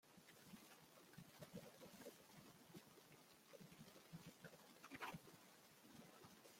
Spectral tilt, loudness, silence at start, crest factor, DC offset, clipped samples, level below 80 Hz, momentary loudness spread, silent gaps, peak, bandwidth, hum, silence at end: -4 dB/octave; -62 LUFS; 0.05 s; 24 dB; under 0.1%; under 0.1%; -88 dBFS; 11 LU; none; -38 dBFS; 16.5 kHz; none; 0 s